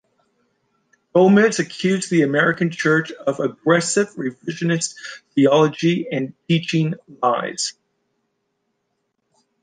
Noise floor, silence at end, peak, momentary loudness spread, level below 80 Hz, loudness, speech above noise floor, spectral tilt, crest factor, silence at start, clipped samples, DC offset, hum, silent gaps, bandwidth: -73 dBFS; 1.9 s; -2 dBFS; 10 LU; -68 dBFS; -19 LUFS; 54 dB; -5 dB/octave; 18 dB; 1.15 s; under 0.1%; under 0.1%; none; none; 10 kHz